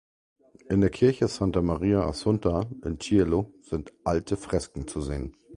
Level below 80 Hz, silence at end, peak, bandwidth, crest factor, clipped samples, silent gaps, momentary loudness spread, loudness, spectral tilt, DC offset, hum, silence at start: -42 dBFS; 0 s; -8 dBFS; 11.5 kHz; 18 dB; under 0.1%; none; 10 LU; -27 LUFS; -7 dB/octave; under 0.1%; none; 0.7 s